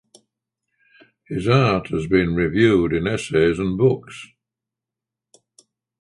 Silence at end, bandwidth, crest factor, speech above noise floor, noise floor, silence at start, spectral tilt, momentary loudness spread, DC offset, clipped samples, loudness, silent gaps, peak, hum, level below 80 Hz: 1.75 s; 11.5 kHz; 18 dB; 68 dB; -86 dBFS; 1.3 s; -7 dB/octave; 11 LU; under 0.1%; under 0.1%; -19 LUFS; none; -4 dBFS; none; -44 dBFS